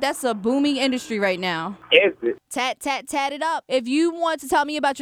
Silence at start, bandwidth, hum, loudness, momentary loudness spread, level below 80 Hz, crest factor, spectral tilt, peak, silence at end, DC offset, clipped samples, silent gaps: 0 s; 18 kHz; none; -22 LUFS; 9 LU; -62 dBFS; 22 dB; -3.5 dB/octave; 0 dBFS; 0 s; under 0.1%; under 0.1%; none